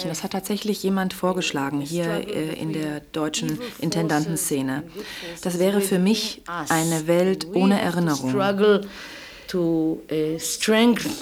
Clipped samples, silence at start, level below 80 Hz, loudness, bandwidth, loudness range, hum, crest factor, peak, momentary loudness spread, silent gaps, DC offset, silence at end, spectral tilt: under 0.1%; 0 s; -56 dBFS; -23 LUFS; over 20 kHz; 4 LU; none; 18 dB; -6 dBFS; 10 LU; none; under 0.1%; 0 s; -4.5 dB/octave